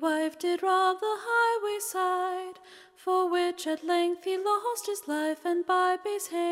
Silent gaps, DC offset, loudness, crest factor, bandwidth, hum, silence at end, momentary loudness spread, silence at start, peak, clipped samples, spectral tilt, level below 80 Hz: none; under 0.1%; -28 LUFS; 16 dB; 16 kHz; none; 0 s; 7 LU; 0 s; -12 dBFS; under 0.1%; -1 dB/octave; -80 dBFS